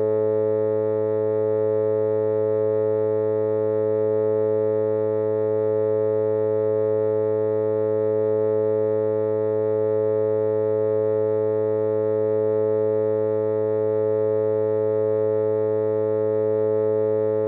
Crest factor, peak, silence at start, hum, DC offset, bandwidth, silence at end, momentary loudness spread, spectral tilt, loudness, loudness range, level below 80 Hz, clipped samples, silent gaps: 8 dB; -14 dBFS; 0 s; none; under 0.1%; 3.6 kHz; 0 s; 1 LU; -12.5 dB/octave; -22 LUFS; 0 LU; -88 dBFS; under 0.1%; none